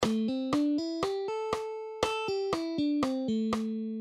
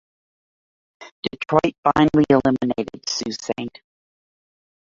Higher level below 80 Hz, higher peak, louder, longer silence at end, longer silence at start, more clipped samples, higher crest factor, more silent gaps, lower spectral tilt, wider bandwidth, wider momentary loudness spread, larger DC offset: second, -60 dBFS vs -52 dBFS; second, -12 dBFS vs -2 dBFS; second, -31 LUFS vs -20 LUFS; second, 0 s vs 1.15 s; second, 0 s vs 1 s; neither; about the same, 20 dB vs 20 dB; second, none vs 1.11-1.23 s, 1.78-1.83 s; about the same, -5 dB/octave vs -5.5 dB/octave; first, 14.5 kHz vs 7.6 kHz; second, 5 LU vs 14 LU; neither